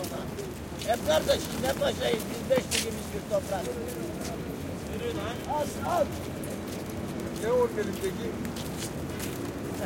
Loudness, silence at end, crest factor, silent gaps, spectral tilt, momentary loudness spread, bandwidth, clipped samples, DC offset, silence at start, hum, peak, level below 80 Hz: -31 LUFS; 0 s; 18 dB; none; -4.5 dB/octave; 9 LU; 17 kHz; under 0.1%; under 0.1%; 0 s; none; -12 dBFS; -50 dBFS